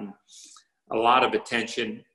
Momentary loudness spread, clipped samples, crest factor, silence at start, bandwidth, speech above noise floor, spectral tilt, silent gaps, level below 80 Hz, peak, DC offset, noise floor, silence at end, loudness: 12 LU; under 0.1%; 20 dB; 0 s; 12 kHz; 28 dB; -3.5 dB/octave; none; -66 dBFS; -6 dBFS; under 0.1%; -53 dBFS; 0.15 s; -24 LUFS